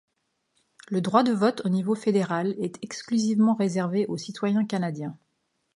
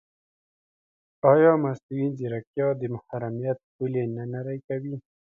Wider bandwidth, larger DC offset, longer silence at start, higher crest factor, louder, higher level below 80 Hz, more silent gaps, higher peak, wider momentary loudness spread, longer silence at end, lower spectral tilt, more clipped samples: first, 11.5 kHz vs 6.6 kHz; neither; second, 0.9 s vs 1.25 s; about the same, 20 dB vs 22 dB; about the same, -25 LUFS vs -26 LUFS; second, -74 dBFS vs -68 dBFS; second, none vs 1.83-1.89 s, 2.47-2.54 s, 3.63-3.79 s, 4.64-4.68 s; about the same, -6 dBFS vs -4 dBFS; second, 10 LU vs 14 LU; first, 0.6 s vs 0.3 s; second, -6.5 dB/octave vs -10.5 dB/octave; neither